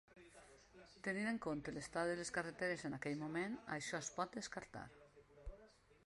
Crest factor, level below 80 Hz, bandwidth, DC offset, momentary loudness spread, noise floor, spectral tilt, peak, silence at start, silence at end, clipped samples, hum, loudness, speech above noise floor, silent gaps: 20 dB; -66 dBFS; 11.5 kHz; under 0.1%; 21 LU; -67 dBFS; -4.5 dB/octave; -26 dBFS; 0.1 s; 0.35 s; under 0.1%; none; -45 LUFS; 23 dB; none